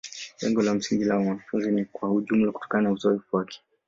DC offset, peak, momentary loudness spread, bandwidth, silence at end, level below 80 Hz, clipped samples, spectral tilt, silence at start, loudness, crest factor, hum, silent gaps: under 0.1%; -8 dBFS; 6 LU; 7.8 kHz; 0.3 s; -64 dBFS; under 0.1%; -6 dB/octave; 0.05 s; -26 LUFS; 16 dB; none; none